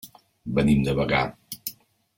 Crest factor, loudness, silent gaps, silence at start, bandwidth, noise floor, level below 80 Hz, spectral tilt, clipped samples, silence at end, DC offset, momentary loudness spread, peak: 18 dB; -24 LUFS; none; 0.05 s; 17 kHz; -43 dBFS; -44 dBFS; -6 dB/octave; under 0.1%; 0.45 s; under 0.1%; 14 LU; -6 dBFS